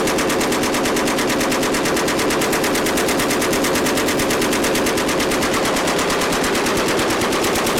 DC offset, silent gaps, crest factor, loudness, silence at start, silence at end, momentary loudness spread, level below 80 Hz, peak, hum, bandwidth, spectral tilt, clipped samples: under 0.1%; none; 8 dB; -17 LUFS; 0 s; 0 s; 1 LU; -40 dBFS; -10 dBFS; none; 17.5 kHz; -3 dB/octave; under 0.1%